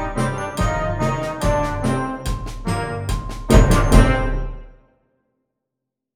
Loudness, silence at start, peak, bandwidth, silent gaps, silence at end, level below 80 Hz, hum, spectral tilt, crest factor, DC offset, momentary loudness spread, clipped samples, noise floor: -20 LUFS; 0 s; 0 dBFS; 15.5 kHz; none; 1.45 s; -22 dBFS; none; -6 dB/octave; 20 dB; under 0.1%; 13 LU; under 0.1%; -82 dBFS